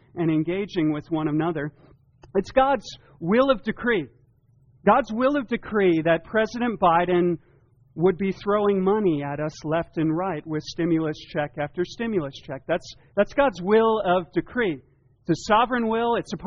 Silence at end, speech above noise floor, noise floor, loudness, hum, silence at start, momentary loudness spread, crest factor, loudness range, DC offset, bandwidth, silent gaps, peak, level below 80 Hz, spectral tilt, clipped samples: 0 s; 36 dB; -59 dBFS; -24 LUFS; none; 0.15 s; 9 LU; 18 dB; 4 LU; under 0.1%; 7.2 kHz; none; -6 dBFS; -52 dBFS; -5 dB/octave; under 0.1%